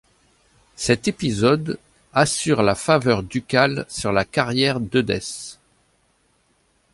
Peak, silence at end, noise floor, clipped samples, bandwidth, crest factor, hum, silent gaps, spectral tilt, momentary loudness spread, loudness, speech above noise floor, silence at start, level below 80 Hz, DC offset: -2 dBFS; 1.4 s; -64 dBFS; under 0.1%; 11.5 kHz; 20 dB; none; none; -4.5 dB/octave; 10 LU; -20 LUFS; 44 dB; 0.8 s; -48 dBFS; under 0.1%